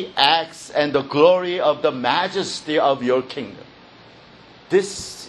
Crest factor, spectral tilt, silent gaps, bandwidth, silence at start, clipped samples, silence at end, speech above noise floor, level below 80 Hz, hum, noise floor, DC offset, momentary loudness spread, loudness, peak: 20 dB; -3.5 dB/octave; none; 12.5 kHz; 0 s; under 0.1%; 0 s; 26 dB; -60 dBFS; none; -46 dBFS; under 0.1%; 10 LU; -19 LUFS; 0 dBFS